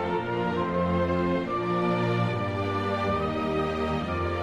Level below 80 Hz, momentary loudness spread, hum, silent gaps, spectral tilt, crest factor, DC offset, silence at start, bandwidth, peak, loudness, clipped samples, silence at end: -46 dBFS; 3 LU; none; none; -7.5 dB/octave; 12 dB; under 0.1%; 0 s; 9.8 kHz; -14 dBFS; -27 LUFS; under 0.1%; 0 s